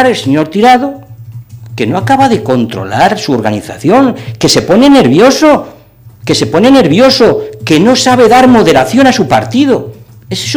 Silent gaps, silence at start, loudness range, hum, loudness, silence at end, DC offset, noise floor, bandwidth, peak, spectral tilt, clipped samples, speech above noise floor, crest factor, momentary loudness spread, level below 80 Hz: none; 0 s; 5 LU; none; -7 LUFS; 0 s; under 0.1%; -36 dBFS; 17 kHz; 0 dBFS; -5 dB/octave; 2%; 29 dB; 8 dB; 11 LU; -40 dBFS